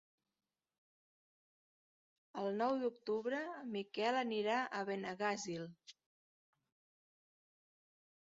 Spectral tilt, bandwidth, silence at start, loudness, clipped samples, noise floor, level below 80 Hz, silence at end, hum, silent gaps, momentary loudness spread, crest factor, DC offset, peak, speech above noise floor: -3 dB/octave; 7.4 kHz; 2.35 s; -40 LUFS; under 0.1%; under -90 dBFS; -88 dBFS; 2.35 s; none; none; 9 LU; 20 dB; under 0.1%; -24 dBFS; over 50 dB